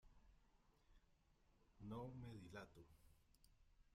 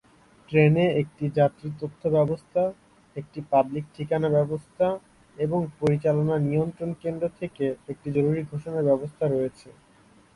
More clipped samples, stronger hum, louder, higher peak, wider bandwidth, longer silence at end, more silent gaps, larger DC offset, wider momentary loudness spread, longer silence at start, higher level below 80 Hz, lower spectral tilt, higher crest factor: neither; neither; second, -57 LUFS vs -25 LUFS; second, -42 dBFS vs -8 dBFS; first, 15.5 kHz vs 11 kHz; second, 0 s vs 0.65 s; neither; neither; about the same, 8 LU vs 10 LU; second, 0.05 s vs 0.5 s; second, -74 dBFS vs -58 dBFS; second, -7 dB/octave vs -9 dB/octave; about the same, 18 dB vs 18 dB